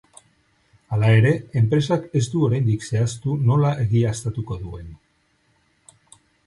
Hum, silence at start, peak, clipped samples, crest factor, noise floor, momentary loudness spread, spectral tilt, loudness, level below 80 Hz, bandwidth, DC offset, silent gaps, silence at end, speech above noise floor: none; 0.9 s; -6 dBFS; under 0.1%; 16 dB; -64 dBFS; 13 LU; -7 dB/octave; -21 LUFS; -48 dBFS; 11.5 kHz; under 0.1%; none; 1.5 s; 45 dB